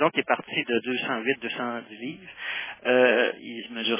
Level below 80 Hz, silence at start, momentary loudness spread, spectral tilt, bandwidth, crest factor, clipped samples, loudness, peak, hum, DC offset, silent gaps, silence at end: -74 dBFS; 0 s; 15 LU; -8 dB/octave; 3.7 kHz; 20 dB; under 0.1%; -26 LUFS; -6 dBFS; none; under 0.1%; none; 0 s